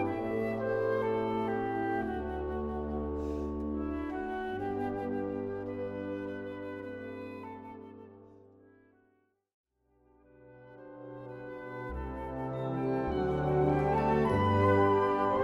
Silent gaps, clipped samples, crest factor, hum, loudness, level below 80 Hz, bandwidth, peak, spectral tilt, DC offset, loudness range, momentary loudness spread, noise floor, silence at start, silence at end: 9.54-9.64 s; under 0.1%; 20 dB; none; -33 LUFS; -48 dBFS; 12 kHz; -14 dBFS; -9 dB/octave; under 0.1%; 20 LU; 17 LU; -73 dBFS; 0 s; 0 s